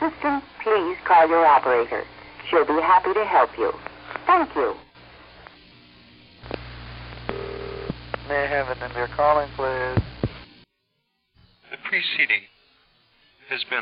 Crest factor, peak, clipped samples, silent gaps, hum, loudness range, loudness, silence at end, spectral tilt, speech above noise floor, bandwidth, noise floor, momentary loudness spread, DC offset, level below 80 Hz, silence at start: 18 dB; -6 dBFS; under 0.1%; none; none; 13 LU; -22 LUFS; 0 s; -9.5 dB/octave; 53 dB; 5.4 kHz; -73 dBFS; 18 LU; under 0.1%; -48 dBFS; 0 s